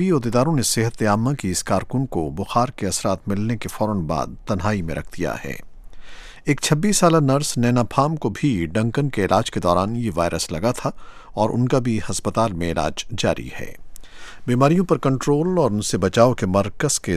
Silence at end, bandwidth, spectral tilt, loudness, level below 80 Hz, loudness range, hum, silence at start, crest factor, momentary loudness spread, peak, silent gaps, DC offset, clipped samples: 0 s; 15.5 kHz; -5.5 dB/octave; -21 LUFS; -42 dBFS; 4 LU; none; 0 s; 20 dB; 10 LU; 0 dBFS; none; under 0.1%; under 0.1%